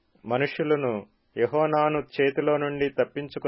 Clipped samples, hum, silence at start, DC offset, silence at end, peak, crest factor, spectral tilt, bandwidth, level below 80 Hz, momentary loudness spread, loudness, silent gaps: under 0.1%; none; 0.25 s; under 0.1%; 0 s; -10 dBFS; 16 dB; -10.5 dB/octave; 5.8 kHz; -62 dBFS; 7 LU; -26 LUFS; none